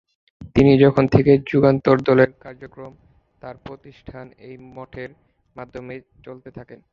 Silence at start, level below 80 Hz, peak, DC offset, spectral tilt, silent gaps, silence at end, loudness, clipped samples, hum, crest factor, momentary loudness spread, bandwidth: 0.4 s; -46 dBFS; -2 dBFS; under 0.1%; -9 dB/octave; none; 0.15 s; -16 LUFS; under 0.1%; none; 20 dB; 25 LU; 6.8 kHz